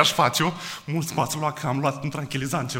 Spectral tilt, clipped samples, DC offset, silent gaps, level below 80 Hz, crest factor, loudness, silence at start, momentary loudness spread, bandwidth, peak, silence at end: -4 dB/octave; under 0.1%; under 0.1%; none; -58 dBFS; 24 dB; -25 LUFS; 0 s; 8 LU; 16.5 kHz; -2 dBFS; 0 s